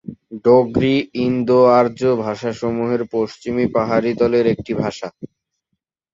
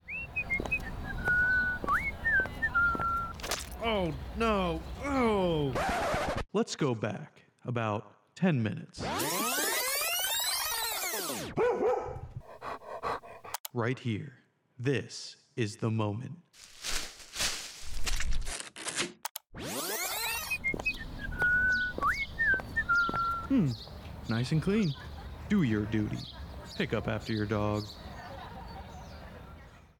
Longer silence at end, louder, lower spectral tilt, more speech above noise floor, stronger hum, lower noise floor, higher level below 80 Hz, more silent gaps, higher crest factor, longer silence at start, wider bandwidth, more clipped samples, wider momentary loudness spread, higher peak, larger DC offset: first, 0.85 s vs 0.2 s; first, -17 LUFS vs -31 LUFS; first, -7.5 dB/octave vs -4 dB/octave; first, 59 dB vs 21 dB; neither; first, -76 dBFS vs -52 dBFS; about the same, -50 dBFS vs -46 dBFS; second, none vs 13.60-13.64 s, 19.31-19.35 s; about the same, 16 dB vs 14 dB; about the same, 0.1 s vs 0.05 s; second, 7.6 kHz vs 19 kHz; neither; second, 9 LU vs 16 LU; first, -2 dBFS vs -18 dBFS; neither